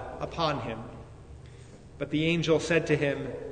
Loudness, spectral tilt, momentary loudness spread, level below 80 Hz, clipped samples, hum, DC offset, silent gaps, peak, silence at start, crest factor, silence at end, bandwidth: -28 LUFS; -5.5 dB/octave; 23 LU; -52 dBFS; under 0.1%; none; under 0.1%; none; -12 dBFS; 0 s; 18 dB; 0 s; 9.6 kHz